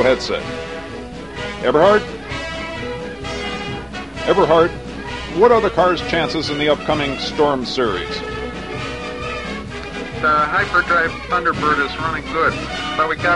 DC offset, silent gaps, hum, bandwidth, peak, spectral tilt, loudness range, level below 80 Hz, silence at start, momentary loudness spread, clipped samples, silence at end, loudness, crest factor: 0.4%; none; none; 11.5 kHz; 0 dBFS; -5 dB/octave; 4 LU; -38 dBFS; 0 s; 14 LU; under 0.1%; 0 s; -19 LUFS; 18 dB